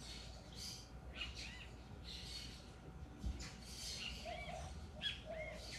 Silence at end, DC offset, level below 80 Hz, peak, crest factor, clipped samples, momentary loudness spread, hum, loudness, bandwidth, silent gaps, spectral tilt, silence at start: 0 s; under 0.1%; -56 dBFS; -32 dBFS; 18 dB; under 0.1%; 10 LU; none; -49 LUFS; 14 kHz; none; -3 dB/octave; 0 s